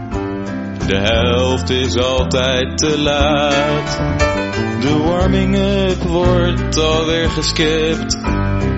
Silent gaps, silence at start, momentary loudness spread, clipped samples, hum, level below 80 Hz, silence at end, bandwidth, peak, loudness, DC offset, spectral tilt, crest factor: none; 0 s; 5 LU; under 0.1%; none; -26 dBFS; 0 s; 8 kHz; 0 dBFS; -16 LUFS; under 0.1%; -4.5 dB/octave; 14 dB